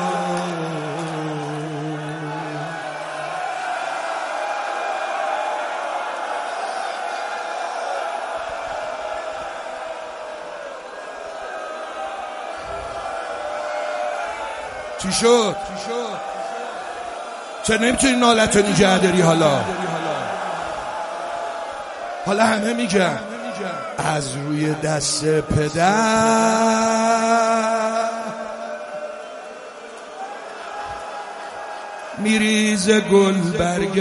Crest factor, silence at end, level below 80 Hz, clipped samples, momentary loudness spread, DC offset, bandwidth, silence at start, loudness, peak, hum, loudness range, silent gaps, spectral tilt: 22 dB; 0 s; -50 dBFS; under 0.1%; 16 LU; under 0.1%; 11.5 kHz; 0 s; -21 LUFS; 0 dBFS; none; 12 LU; none; -4 dB/octave